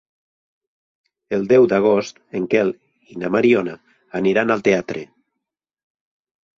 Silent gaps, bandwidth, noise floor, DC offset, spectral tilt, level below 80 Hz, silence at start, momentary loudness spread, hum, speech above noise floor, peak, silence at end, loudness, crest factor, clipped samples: none; 7.2 kHz; -82 dBFS; under 0.1%; -6.5 dB/octave; -60 dBFS; 1.3 s; 16 LU; none; 64 dB; -4 dBFS; 1.5 s; -18 LUFS; 18 dB; under 0.1%